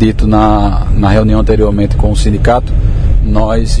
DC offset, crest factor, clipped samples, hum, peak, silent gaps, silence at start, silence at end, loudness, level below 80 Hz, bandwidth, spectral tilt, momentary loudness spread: 1%; 8 dB; 0.6%; none; 0 dBFS; none; 0 s; 0 s; -11 LUFS; -12 dBFS; 10 kHz; -7.5 dB/octave; 4 LU